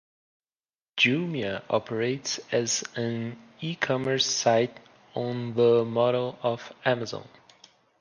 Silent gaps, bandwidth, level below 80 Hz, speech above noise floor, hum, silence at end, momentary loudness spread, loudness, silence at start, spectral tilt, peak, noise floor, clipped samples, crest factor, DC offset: none; 10 kHz; -70 dBFS; over 63 dB; none; 0.75 s; 13 LU; -26 LUFS; 0.95 s; -4 dB/octave; -8 dBFS; under -90 dBFS; under 0.1%; 20 dB; under 0.1%